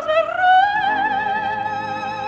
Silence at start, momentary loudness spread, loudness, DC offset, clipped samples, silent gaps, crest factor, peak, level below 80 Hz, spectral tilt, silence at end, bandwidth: 0 s; 10 LU; -18 LUFS; under 0.1%; under 0.1%; none; 14 dB; -6 dBFS; -56 dBFS; -4.5 dB/octave; 0 s; 7.6 kHz